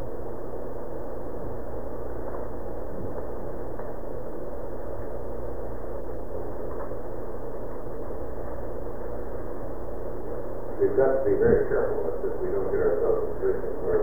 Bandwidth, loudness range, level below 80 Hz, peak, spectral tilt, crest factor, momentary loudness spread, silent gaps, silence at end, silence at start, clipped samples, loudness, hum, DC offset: over 20 kHz; 11 LU; -40 dBFS; -8 dBFS; -9.5 dB/octave; 22 dB; 13 LU; none; 0 s; 0 s; under 0.1%; -31 LUFS; none; 5%